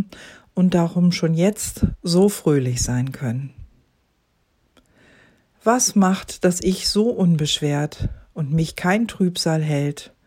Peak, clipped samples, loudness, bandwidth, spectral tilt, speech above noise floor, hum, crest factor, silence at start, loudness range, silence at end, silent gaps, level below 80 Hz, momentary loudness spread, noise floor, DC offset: -4 dBFS; under 0.1%; -20 LUFS; 16 kHz; -5 dB/octave; 46 dB; none; 18 dB; 0 s; 5 LU; 0.2 s; none; -42 dBFS; 10 LU; -66 dBFS; under 0.1%